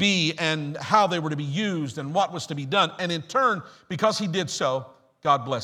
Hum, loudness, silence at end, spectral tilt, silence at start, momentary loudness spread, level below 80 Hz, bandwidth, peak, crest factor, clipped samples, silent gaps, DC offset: none; -25 LUFS; 0 s; -4.5 dB/octave; 0 s; 9 LU; -68 dBFS; 15 kHz; -4 dBFS; 20 dB; under 0.1%; none; under 0.1%